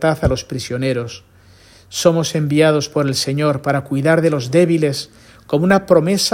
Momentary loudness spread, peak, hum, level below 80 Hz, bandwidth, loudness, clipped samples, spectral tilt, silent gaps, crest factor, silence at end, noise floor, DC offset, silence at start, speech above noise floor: 10 LU; 0 dBFS; none; -40 dBFS; 16.5 kHz; -16 LUFS; under 0.1%; -5.5 dB/octave; none; 16 dB; 0 s; -46 dBFS; under 0.1%; 0 s; 30 dB